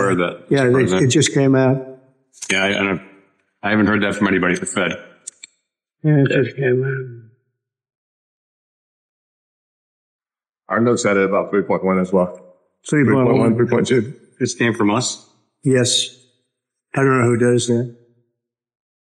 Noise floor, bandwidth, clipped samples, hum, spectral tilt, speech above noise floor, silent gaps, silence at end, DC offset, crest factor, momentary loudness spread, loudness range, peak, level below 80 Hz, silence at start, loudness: -77 dBFS; 12 kHz; under 0.1%; none; -5 dB/octave; 60 dB; 7.95-10.19 s; 1.15 s; under 0.1%; 14 dB; 12 LU; 5 LU; -6 dBFS; -58 dBFS; 0 s; -17 LUFS